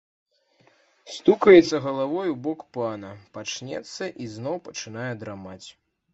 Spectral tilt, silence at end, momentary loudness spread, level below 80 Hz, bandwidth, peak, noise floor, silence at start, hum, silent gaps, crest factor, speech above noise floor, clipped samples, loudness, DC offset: -5.5 dB/octave; 0.45 s; 23 LU; -64 dBFS; 8 kHz; -2 dBFS; -62 dBFS; 1.05 s; none; none; 22 dB; 39 dB; under 0.1%; -23 LUFS; under 0.1%